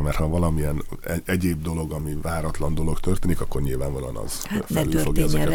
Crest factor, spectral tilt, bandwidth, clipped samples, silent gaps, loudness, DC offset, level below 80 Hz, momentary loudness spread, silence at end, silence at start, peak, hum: 16 dB; -6 dB/octave; 17.5 kHz; under 0.1%; none; -26 LUFS; under 0.1%; -28 dBFS; 7 LU; 0 s; 0 s; -6 dBFS; none